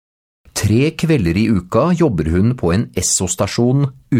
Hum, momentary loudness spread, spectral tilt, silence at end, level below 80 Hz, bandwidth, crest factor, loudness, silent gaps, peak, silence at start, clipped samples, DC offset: none; 3 LU; -5.5 dB/octave; 0 s; -36 dBFS; 16.5 kHz; 14 dB; -16 LUFS; none; -2 dBFS; 0.55 s; under 0.1%; under 0.1%